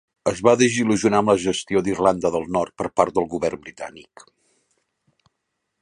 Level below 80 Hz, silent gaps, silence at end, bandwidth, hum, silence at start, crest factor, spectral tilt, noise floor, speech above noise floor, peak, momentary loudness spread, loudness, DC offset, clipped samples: -54 dBFS; none; 1.8 s; 11.5 kHz; none; 0.25 s; 20 dB; -5 dB/octave; -77 dBFS; 57 dB; -2 dBFS; 11 LU; -20 LUFS; under 0.1%; under 0.1%